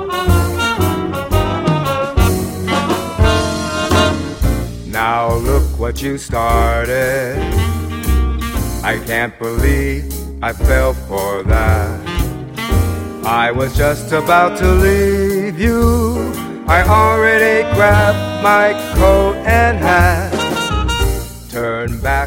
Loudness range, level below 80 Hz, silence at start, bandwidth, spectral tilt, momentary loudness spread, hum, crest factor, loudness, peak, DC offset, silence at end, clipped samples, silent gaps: 5 LU; -20 dBFS; 0 s; 17 kHz; -5.5 dB/octave; 9 LU; none; 14 dB; -15 LUFS; 0 dBFS; under 0.1%; 0 s; under 0.1%; none